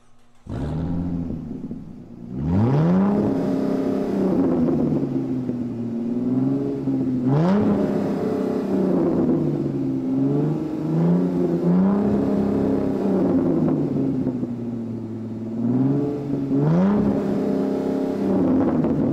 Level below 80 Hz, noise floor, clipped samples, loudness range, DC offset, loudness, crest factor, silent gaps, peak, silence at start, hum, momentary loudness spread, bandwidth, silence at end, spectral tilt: -46 dBFS; -44 dBFS; under 0.1%; 2 LU; under 0.1%; -22 LUFS; 14 dB; none; -8 dBFS; 0.1 s; none; 10 LU; 8 kHz; 0 s; -10 dB/octave